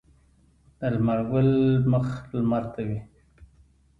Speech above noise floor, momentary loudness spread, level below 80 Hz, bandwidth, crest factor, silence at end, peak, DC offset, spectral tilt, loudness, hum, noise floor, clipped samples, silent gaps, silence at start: 37 dB; 11 LU; -50 dBFS; 5 kHz; 14 dB; 0.55 s; -12 dBFS; under 0.1%; -10 dB/octave; -25 LUFS; none; -60 dBFS; under 0.1%; none; 0.8 s